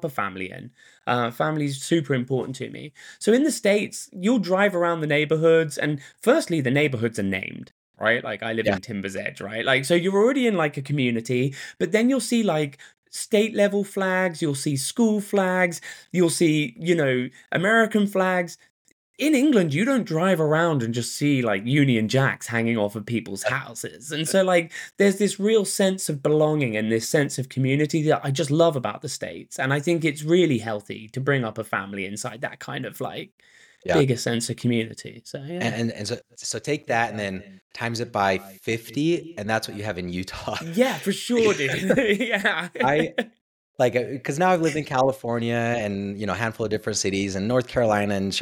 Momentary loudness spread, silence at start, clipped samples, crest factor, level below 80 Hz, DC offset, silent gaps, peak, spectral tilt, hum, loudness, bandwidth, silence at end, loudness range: 11 LU; 0 s; under 0.1%; 16 dB; -62 dBFS; under 0.1%; 7.71-7.94 s, 12.98-13.03 s, 18.70-18.85 s, 18.92-19.14 s, 33.32-33.38 s, 37.62-37.70 s, 43.41-43.74 s; -6 dBFS; -5 dB/octave; none; -23 LUFS; 19 kHz; 0 s; 5 LU